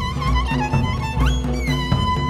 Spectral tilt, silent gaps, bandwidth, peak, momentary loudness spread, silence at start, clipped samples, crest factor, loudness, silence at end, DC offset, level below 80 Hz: -6 dB/octave; none; 13.5 kHz; -6 dBFS; 2 LU; 0 s; under 0.1%; 14 dB; -21 LUFS; 0 s; under 0.1%; -24 dBFS